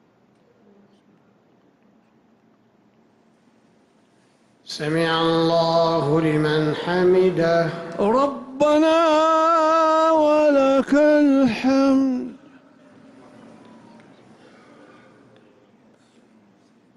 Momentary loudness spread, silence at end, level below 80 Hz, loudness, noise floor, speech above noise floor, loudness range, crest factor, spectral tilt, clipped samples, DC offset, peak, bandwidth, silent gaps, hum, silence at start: 8 LU; 4.6 s; -58 dBFS; -18 LUFS; -58 dBFS; 41 dB; 9 LU; 12 dB; -6.5 dB/octave; under 0.1%; under 0.1%; -8 dBFS; 12 kHz; none; none; 4.7 s